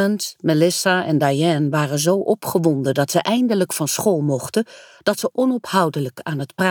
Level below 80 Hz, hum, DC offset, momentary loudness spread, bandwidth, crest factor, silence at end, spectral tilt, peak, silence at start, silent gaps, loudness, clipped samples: -64 dBFS; none; under 0.1%; 7 LU; over 20 kHz; 16 dB; 0 s; -5 dB/octave; -2 dBFS; 0 s; none; -19 LUFS; under 0.1%